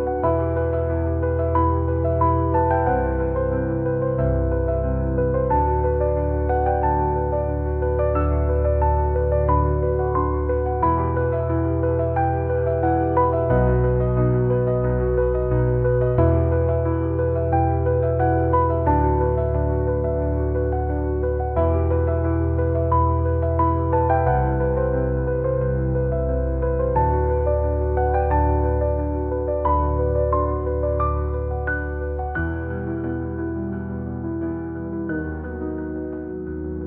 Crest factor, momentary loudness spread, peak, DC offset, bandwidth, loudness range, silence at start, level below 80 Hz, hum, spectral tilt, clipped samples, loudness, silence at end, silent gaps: 14 dB; 8 LU; -6 dBFS; 0.2%; 3.2 kHz; 5 LU; 0 s; -28 dBFS; none; -14 dB/octave; under 0.1%; -22 LUFS; 0 s; none